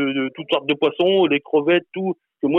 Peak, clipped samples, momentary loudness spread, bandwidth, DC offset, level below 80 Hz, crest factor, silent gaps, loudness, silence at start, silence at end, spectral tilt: -6 dBFS; under 0.1%; 9 LU; 4.1 kHz; under 0.1%; -68 dBFS; 14 dB; none; -20 LUFS; 0 s; 0 s; -7.5 dB/octave